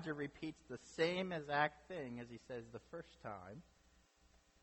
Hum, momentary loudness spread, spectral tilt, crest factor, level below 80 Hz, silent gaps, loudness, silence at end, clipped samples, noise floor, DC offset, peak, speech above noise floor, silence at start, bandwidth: none; 15 LU; -5.5 dB/octave; 24 dB; -72 dBFS; none; -44 LUFS; 1 s; under 0.1%; -72 dBFS; under 0.1%; -22 dBFS; 28 dB; 0 s; 8.4 kHz